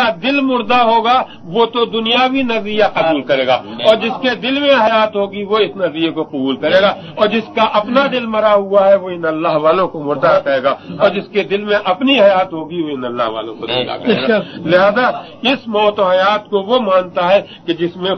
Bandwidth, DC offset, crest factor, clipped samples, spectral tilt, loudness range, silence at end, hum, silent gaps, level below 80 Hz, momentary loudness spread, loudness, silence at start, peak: 6.4 kHz; under 0.1%; 14 dB; under 0.1%; -6 dB/octave; 2 LU; 0 s; none; none; -56 dBFS; 8 LU; -14 LUFS; 0 s; 0 dBFS